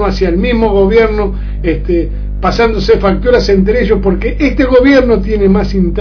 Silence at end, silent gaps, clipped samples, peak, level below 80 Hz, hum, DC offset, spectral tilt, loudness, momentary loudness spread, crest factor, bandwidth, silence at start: 0 s; none; 0.6%; 0 dBFS; -18 dBFS; 50 Hz at -20 dBFS; under 0.1%; -7.5 dB/octave; -11 LUFS; 8 LU; 10 dB; 5.4 kHz; 0 s